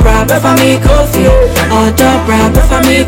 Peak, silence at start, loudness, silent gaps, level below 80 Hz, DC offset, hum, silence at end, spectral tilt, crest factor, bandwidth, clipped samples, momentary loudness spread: 0 dBFS; 0 s; -8 LUFS; none; -12 dBFS; under 0.1%; none; 0 s; -5 dB/octave; 6 dB; 17.5 kHz; under 0.1%; 2 LU